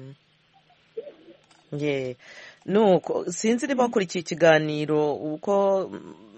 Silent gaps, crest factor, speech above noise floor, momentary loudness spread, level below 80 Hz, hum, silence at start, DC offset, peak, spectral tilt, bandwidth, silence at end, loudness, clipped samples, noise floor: none; 20 dB; 38 dB; 21 LU; -70 dBFS; none; 0 s; under 0.1%; -6 dBFS; -5 dB/octave; 8.4 kHz; 0 s; -23 LUFS; under 0.1%; -61 dBFS